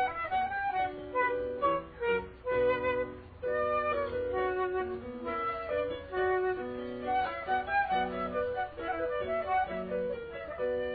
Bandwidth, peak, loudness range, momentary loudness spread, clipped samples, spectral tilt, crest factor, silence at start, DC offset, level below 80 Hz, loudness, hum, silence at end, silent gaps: 4.9 kHz; -18 dBFS; 2 LU; 7 LU; under 0.1%; -8.5 dB/octave; 14 dB; 0 s; under 0.1%; -56 dBFS; -33 LUFS; none; 0 s; none